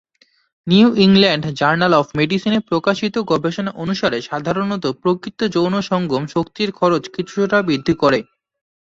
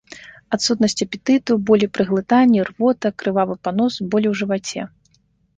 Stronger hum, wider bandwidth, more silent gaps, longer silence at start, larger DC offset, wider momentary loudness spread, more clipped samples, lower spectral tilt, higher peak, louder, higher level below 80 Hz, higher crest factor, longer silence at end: neither; second, 7.6 kHz vs 9.4 kHz; neither; first, 0.65 s vs 0.1 s; neither; about the same, 9 LU vs 11 LU; neither; about the same, -6 dB/octave vs -5 dB/octave; first, 0 dBFS vs -4 dBFS; about the same, -17 LUFS vs -19 LUFS; first, -52 dBFS vs -58 dBFS; about the same, 16 dB vs 16 dB; about the same, 0.8 s vs 0.7 s